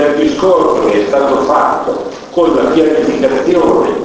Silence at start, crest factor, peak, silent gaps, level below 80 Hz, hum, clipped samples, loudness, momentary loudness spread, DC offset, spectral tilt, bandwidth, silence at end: 0 s; 10 dB; 0 dBFS; none; -42 dBFS; none; under 0.1%; -11 LUFS; 5 LU; under 0.1%; -5.5 dB/octave; 8 kHz; 0 s